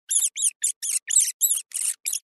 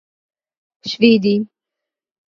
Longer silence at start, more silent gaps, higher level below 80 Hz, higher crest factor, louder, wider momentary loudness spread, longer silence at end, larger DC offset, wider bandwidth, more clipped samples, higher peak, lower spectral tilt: second, 0.1 s vs 0.85 s; first, 0.56-0.60 s, 0.76-0.81 s, 1.34-1.40 s vs none; second, under -90 dBFS vs -66 dBFS; about the same, 18 dB vs 20 dB; second, -21 LUFS vs -15 LUFS; second, 6 LU vs 18 LU; second, 0.05 s vs 0.9 s; neither; first, 12.5 kHz vs 7 kHz; neither; second, -8 dBFS vs 0 dBFS; second, 7.5 dB/octave vs -6.5 dB/octave